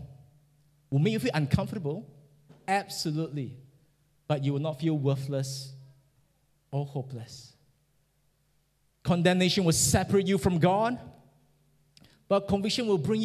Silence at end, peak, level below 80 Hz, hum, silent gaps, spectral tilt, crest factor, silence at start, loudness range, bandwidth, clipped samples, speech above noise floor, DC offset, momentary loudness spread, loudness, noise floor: 0 s; -10 dBFS; -52 dBFS; none; none; -5 dB/octave; 20 dB; 0 s; 11 LU; 15 kHz; under 0.1%; 43 dB; under 0.1%; 16 LU; -28 LUFS; -71 dBFS